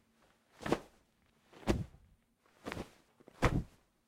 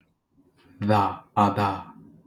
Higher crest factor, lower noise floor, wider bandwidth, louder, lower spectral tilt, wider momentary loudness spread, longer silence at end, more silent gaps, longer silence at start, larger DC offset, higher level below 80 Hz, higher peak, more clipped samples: first, 28 dB vs 20 dB; first, -72 dBFS vs -64 dBFS; first, 16 kHz vs 13.5 kHz; second, -39 LUFS vs -24 LUFS; second, -6 dB/octave vs -7.5 dB/octave; first, 16 LU vs 12 LU; about the same, 0.45 s vs 0.35 s; neither; second, 0.6 s vs 0.8 s; neither; first, -48 dBFS vs -64 dBFS; second, -12 dBFS vs -6 dBFS; neither